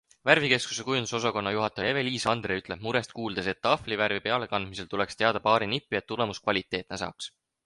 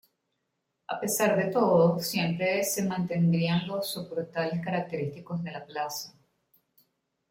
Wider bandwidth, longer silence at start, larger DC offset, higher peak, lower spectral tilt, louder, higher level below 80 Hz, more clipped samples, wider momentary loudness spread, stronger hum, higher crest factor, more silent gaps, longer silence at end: second, 11.5 kHz vs 16.5 kHz; second, 0.25 s vs 0.9 s; neither; first, -4 dBFS vs -12 dBFS; about the same, -4 dB/octave vs -5 dB/octave; about the same, -28 LUFS vs -28 LUFS; first, -58 dBFS vs -70 dBFS; neither; about the same, 10 LU vs 12 LU; neither; first, 26 dB vs 18 dB; neither; second, 0.4 s vs 1.2 s